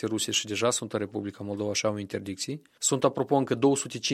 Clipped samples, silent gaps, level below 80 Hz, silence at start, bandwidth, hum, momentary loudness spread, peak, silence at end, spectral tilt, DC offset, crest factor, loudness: under 0.1%; none; -70 dBFS; 0 s; 15.5 kHz; none; 10 LU; -8 dBFS; 0 s; -3.5 dB/octave; under 0.1%; 20 dB; -28 LUFS